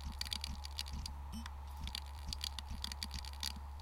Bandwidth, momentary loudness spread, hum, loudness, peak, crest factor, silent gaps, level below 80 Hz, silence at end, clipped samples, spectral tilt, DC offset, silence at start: 17 kHz; 6 LU; none; -44 LUFS; -20 dBFS; 24 dB; none; -48 dBFS; 0 s; under 0.1%; -2.5 dB/octave; under 0.1%; 0 s